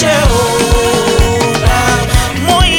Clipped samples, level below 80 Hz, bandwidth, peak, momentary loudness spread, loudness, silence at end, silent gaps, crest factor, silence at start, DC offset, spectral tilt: under 0.1%; -16 dBFS; 19.5 kHz; 0 dBFS; 2 LU; -11 LUFS; 0 s; none; 10 dB; 0 s; under 0.1%; -4 dB/octave